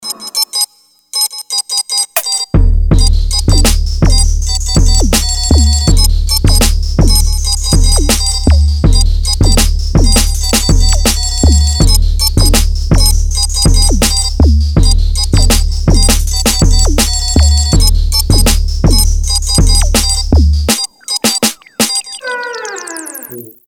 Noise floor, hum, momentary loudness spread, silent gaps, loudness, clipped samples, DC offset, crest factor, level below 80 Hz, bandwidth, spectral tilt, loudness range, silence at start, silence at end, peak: -34 dBFS; none; 5 LU; none; -11 LUFS; 0.3%; under 0.1%; 10 dB; -10 dBFS; 20 kHz; -3.5 dB/octave; 2 LU; 0 s; 0.2 s; 0 dBFS